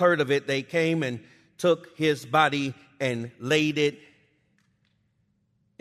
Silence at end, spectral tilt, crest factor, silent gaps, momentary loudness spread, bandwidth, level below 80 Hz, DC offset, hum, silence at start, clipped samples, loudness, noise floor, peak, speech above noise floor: 1.85 s; -5 dB/octave; 20 dB; none; 9 LU; 13.5 kHz; -70 dBFS; under 0.1%; none; 0 s; under 0.1%; -25 LUFS; -71 dBFS; -6 dBFS; 46 dB